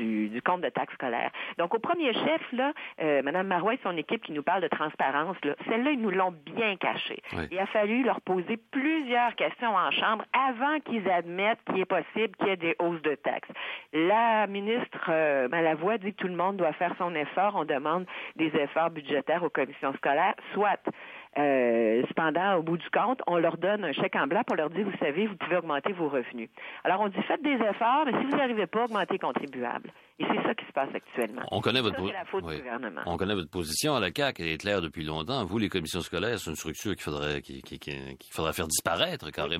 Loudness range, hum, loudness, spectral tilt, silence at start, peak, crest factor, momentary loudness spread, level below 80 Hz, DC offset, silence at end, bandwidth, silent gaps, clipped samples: 4 LU; none; -29 LUFS; -4.5 dB/octave; 0 s; -10 dBFS; 18 dB; 8 LU; -60 dBFS; under 0.1%; 0 s; 16 kHz; none; under 0.1%